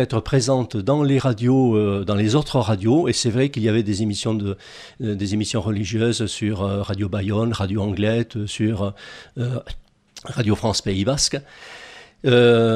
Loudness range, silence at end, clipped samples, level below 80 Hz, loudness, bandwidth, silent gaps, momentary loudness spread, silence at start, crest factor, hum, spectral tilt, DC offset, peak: 5 LU; 0 s; under 0.1%; -46 dBFS; -21 LUFS; 12.5 kHz; none; 13 LU; 0 s; 16 dB; none; -5.5 dB/octave; under 0.1%; -4 dBFS